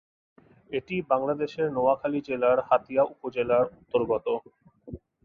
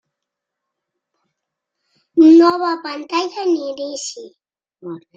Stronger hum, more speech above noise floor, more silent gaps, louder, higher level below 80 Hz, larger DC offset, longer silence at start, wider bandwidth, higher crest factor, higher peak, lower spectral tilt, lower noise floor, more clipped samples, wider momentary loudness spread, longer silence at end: neither; second, 19 dB vs 66 dB; neither; second, -27 LUFS vs -15 LUFS; first, -60 dBFS vs -68 dBFS; neither; second, 0.7 s vs 2.15 s; second, 6.6 kHz vs 7.8 kHz; about the same, 18 dB vs 16 dB; second, -10 dBFS vs -2 dBFS; first, -8 dB/octave vs -4 dB/octave; second, -45 dBFS vs -81 dBFS; neither; second, 10 LU vs 22 LU; about the same, 0.3 s vs 0.2 s